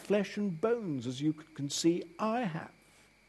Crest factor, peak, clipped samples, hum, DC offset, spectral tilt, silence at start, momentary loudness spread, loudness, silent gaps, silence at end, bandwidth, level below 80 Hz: 18 dB; -16 dBFS; under 0.1%; none; under 0.1%; -5 dB/octave; 0 s; 8 LU; -34 LUFS; none; 0.6 s; 12.5 kHz; -74 dBFS